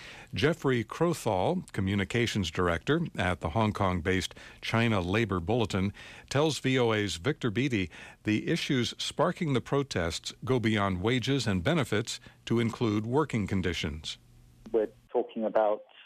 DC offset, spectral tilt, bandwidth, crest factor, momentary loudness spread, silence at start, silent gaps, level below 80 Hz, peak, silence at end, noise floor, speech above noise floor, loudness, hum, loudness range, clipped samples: under 0.1%; -5.5 dB/octave; 15 kHz; 14 dB; 6 LU; 0 s; none; -52 dBFS; -16 dBFS; 0.05 s; -53 dBFS; 24 dB; -30 LUFS; none; 2 LU; under 0.1%